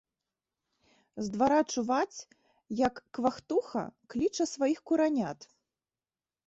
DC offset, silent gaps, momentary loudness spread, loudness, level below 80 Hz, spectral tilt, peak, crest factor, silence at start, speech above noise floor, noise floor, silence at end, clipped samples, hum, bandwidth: under 0.1%; none; 12 LU; -31 LUFS; -66 dBFS; -4.5 dB/octave; -14 dBFS; 18 dB; 1.15 s; over 60 dB; under -90 dBFS; 1 s; under 0.1%; none; 8.2 kHz